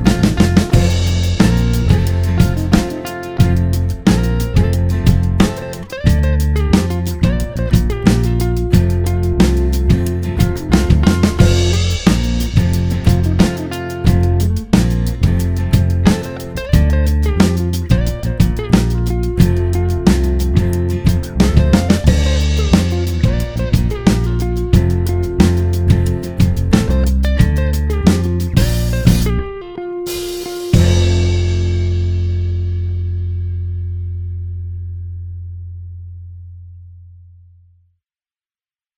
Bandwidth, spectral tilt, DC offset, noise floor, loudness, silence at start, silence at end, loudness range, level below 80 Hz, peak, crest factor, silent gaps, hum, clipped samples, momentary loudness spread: over 20 kHz; -6.5 dB/octave; under 0.1%; under -90 dBFS; -15 LUFS; 0 s; 1.9 s; 6 LU; -20 dBFS; 0 dBFS; 14 dB; none; none; 0.1%; 10 LU